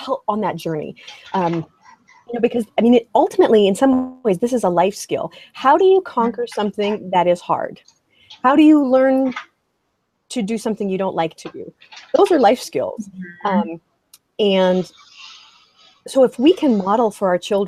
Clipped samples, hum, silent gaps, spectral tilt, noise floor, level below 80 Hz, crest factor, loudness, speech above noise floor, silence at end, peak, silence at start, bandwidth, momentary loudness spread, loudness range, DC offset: under 0.1%; none; none; -6 dB/octave; -70 dBFS; -62 dBFS; 16 dB; -17 LUFS; 53 dB; 0 s; -2 dBFS; 0 s; 14.5 kHz; 17 LU; 4 LU; under 0.1%